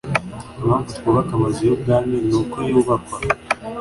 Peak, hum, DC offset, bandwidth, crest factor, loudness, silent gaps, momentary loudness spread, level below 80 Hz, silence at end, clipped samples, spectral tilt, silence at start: -2 dBFS; none; under 0.1%; 11.5 kHz; 18 dB; -20 LUFS; none; 6 LU; -42 dBFS; 0 s; under 0.1%; -7 dB/octave; 0.05 s